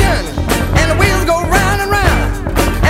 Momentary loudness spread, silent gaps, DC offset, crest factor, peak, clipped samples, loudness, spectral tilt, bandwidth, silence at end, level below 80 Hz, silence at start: 5 LU; none; under 0.1%; 12 dB; 0 dBFS; under 0.1%; -13 LUFS; -5 dB/octave; 16.5 kHz; 0 s; -18 dBFS; 0 s